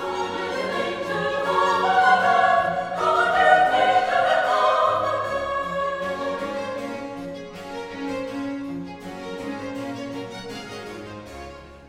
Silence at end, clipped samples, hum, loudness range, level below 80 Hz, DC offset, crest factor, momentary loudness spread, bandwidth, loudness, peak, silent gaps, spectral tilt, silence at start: 0 s; under 0.1%; none; 13 LU; -54 dBFS; under 0.1%; 20 dB; 18 LU; 14 kHz; -22 LUFS; -4 dBFS; none; -4.5 dB/octave; 0 s